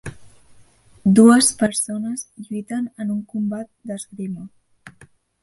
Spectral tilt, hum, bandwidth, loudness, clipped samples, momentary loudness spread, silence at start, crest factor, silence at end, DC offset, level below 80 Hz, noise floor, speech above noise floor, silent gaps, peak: -4.5 dB/octave; none; 12 kHz; -19 LUFS; under 0.1%; 20 LU; 0.05 s; 20 dB; 0.55 s; under 0.1%; -58 dBFS; -52 dBFS; 33 dB; none; -2 dBFS